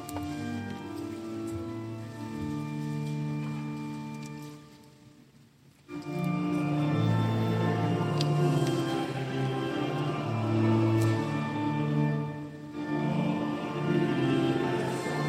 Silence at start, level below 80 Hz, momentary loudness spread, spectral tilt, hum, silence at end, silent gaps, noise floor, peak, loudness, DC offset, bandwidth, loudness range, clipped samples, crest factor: 0 s; -62 dBFS; 12 LU; -7 dB/octave; none; 0 s; none; -58 dBFS; -14 dBFS; -30 LUFS; under 0.1%; 15 kHz; 8 LU; under 0.1%; 16 dB